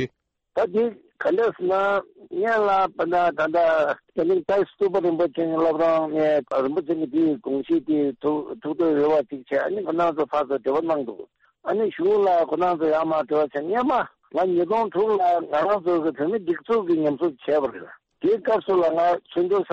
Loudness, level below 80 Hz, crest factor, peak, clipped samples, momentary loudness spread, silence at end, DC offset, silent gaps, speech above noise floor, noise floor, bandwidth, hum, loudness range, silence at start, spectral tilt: -23 LUFS; -64 dBFS; 12 dB; -10 dBFS; under 0.1%; 7 LU; 0 s; under 0.1%; none; 34 dB; -56 dBFS; 7.4 kHz; none; 2 LU; 0 s; -7.5 dB/octave